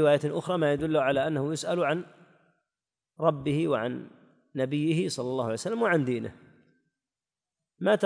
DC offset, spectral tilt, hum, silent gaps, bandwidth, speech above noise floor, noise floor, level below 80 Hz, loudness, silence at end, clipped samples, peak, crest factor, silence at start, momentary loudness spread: under 0.1%; -6 dB/octave; none; none; 10.5 kHz; over 63 dB; under -90 dBFS; -64 dBFS; -28 LUFS; 0 s; under 0.1%; -8 dBFS; 20 dB; 0 s; 8 LU